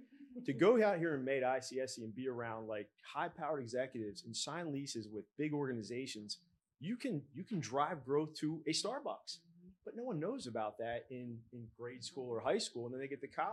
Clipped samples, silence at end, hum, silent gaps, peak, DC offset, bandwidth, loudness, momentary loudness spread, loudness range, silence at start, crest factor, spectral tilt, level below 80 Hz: under 0.1%; 0 s; none; none; -18 dBFS; under 0.1%; 12.5 kHz; -40 LUFS; 12 LU; 6 LU; 0 s; 22 dB; -4.5 dB/octave; -82 dBFS